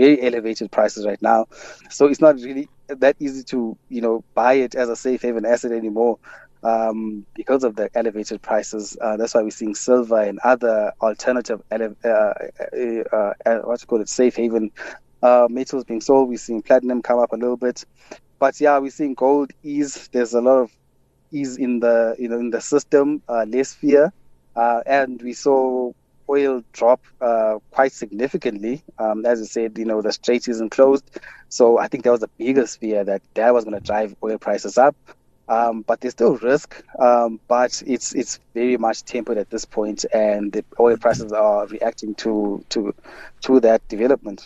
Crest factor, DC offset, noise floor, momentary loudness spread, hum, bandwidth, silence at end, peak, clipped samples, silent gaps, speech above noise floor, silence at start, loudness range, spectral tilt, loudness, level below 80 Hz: 18 dB; under 0.1%; -60 dBFS; 10 LU; none; 8.4 kHz; 0.1 s; -2 dBFS; under 0.1%; none; 40 dB; 0 s; 3 LU; -4.5 dB/octave; -20 LUFS; -56 dBFS